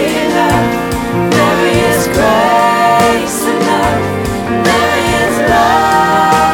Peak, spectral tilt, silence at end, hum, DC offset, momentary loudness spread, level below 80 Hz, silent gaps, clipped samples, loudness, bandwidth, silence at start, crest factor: 0 dBFS; -4.5 dB/octave; 0 s; none; under 0.1%; 5 LU; -32 dBFS; none; under 0.1%; -11 LUFS; 19 kHz; 0 s; 10 dB